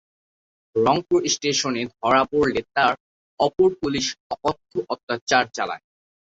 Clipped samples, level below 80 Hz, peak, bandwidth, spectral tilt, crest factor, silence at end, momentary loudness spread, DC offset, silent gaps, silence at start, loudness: under 0.1%; -56 dBFS; -2 dBFS; 7.8 kHz; -3.5 dB/octave; 20 dB; 0.65 s; 9 LU; under 0.1%; 3.00-3.37 s, 4.20-4.30 s, 5.03-5.07 s, 5.21-5.27 s; 0.75 s; -22 LUFS